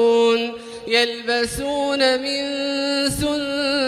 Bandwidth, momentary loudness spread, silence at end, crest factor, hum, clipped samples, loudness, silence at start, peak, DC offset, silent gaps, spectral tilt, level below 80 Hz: 15.5 kHz; 5 LU; 0 s; 16 dB; none; under 0.1%; -20 LUFS; 0 s; -4 dBFS; under 0.1%; none; -3 dB/octave; -46 dBFS